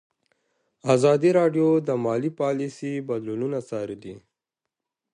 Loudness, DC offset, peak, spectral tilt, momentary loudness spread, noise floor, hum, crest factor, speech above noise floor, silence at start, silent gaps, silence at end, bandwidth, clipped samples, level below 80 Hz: -23 LUFS; under 0.1%; -6 dBFS; -7 dB/octave; 14 LU; -86 dBFS; none; 20 dB; 63 dB; 0.85 s; none; 0.95 s; 11 kHz; under 0.1%; -70 dBFS